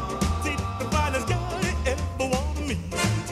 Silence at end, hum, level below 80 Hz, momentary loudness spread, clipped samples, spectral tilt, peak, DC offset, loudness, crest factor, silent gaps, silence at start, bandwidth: 0 s; none; -32 dBFS; 4 LU; under 0.1%; -5 dB/octave; -10 dBFS; under 0.1%; -27 LUFS; 16 dB; none; 0 s; 14.5 kHz